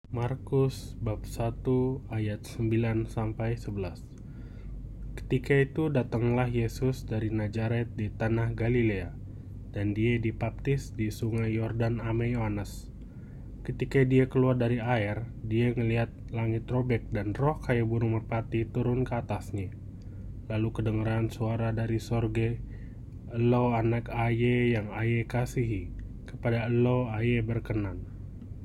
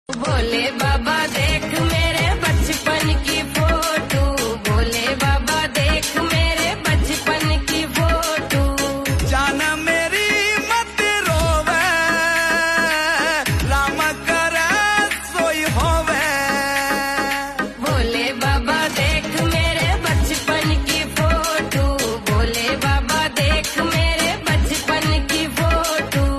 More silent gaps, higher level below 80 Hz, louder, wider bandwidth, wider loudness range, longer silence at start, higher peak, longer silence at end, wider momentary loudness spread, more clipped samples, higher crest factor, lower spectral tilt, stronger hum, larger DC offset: neither; second, -44 dBFS vs -26 dBFS; second, -30 LUFS vs -18 LUFS; about the same, 13 kHz vs 13.5 kHz; about the same, 3 LU vs 2 LU; about the same, 0.05 s vs 0.1 s; second, -12 dBFS vs -6 dBFS; about the same, 0 s vs 0 s; first, 17 LU vs 3 LU; neither; first, 18 dB vs 12 dB; first, -8 dB/octave vs -4 dB/octave; neither; neither